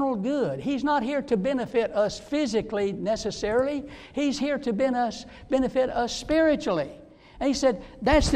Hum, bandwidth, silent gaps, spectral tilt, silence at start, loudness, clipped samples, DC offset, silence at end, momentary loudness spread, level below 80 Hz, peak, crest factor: none; 11 kHz; none; -5 dB/octave; 0 s; -26 LUFS; under 0.1%; under 0.1%; 0 s; 6 LU; -42 dBFS; -8 dBFS; 18 dB